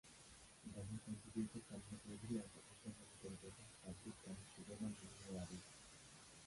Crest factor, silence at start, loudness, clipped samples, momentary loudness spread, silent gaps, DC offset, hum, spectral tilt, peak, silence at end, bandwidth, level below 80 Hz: 20 dB; 0.05 s; -54 LUFS; under 0.1%; 11 LU; none; under 0.1%; none; -5 dB/octave; -34 dBFS; 0 s; 11.5 kHz; -70 dBFS